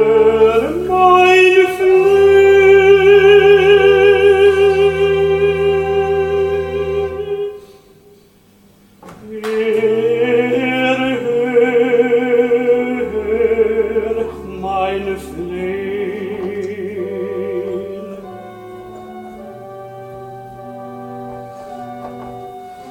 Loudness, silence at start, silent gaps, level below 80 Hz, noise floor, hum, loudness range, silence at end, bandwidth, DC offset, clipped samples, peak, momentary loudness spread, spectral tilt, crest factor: -13 LUFS; 0 s; none; -42 dBFS; -48 dBFS; none; 22 LU; 0 s; 12.5 kHz; under 0.1%; under 0.1%; 0 dBFS; 24 LU; -6 dB/octave; 14 dB